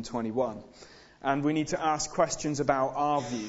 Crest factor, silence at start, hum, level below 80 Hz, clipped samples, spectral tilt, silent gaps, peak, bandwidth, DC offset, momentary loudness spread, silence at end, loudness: 20 dB; 0 s; none; -56 dBFS; under 0.1%; -4.5 dB/octave; none; -10 dBFS; 8 kHz; under 0.1%; 5 LU; 0 s; -29 LUFS